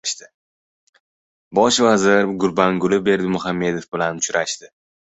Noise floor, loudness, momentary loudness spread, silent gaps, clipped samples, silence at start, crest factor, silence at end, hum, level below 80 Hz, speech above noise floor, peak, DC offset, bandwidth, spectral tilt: under -90 dBFS; -18 LUFS; 10 LU; 0.34-0.93 s, 1.00-1.51 s; under 0.1%; 0.05 s; 18 dB; 0.35 s; none; -56 dBFS; over 72 dB; -2 dBFS; under 0.1%; 8.2 kHz; -4 dB/octave